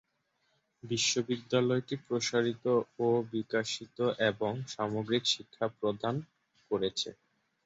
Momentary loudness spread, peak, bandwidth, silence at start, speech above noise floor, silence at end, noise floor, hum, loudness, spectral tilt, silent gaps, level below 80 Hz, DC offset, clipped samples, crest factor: 7 LU; -14 dBFS; 8 kHz; 0.85 s; 45 dB; 0.55 s; -77 dBFS; none; -32 LUFS; -4 dB/octave; none; -72 dBFS; under 0.1%; under 0.1%; 18 dB